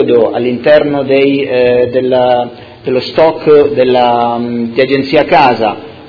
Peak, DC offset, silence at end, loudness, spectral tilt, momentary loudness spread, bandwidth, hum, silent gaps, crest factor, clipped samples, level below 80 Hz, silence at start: 0 dBFS; under 0.1%; 0 s; -10 LUFS; -7.5 dB/octave; 8 LU; 5.4 kHz; none; none; 10 dB; 0.9%; -46 dBFS; 0 s